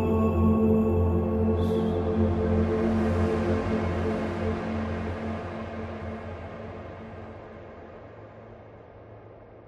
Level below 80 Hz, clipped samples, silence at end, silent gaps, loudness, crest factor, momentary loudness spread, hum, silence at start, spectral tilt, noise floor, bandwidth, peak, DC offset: -40 dBFS; under 0.1%; 0 s; none; -27 LUFS; 16 dB; 23 LU; none; 0 s; -9 dB/octave; -48 dBFS; 7.4 kHz; -12 dBFS; under 0.1%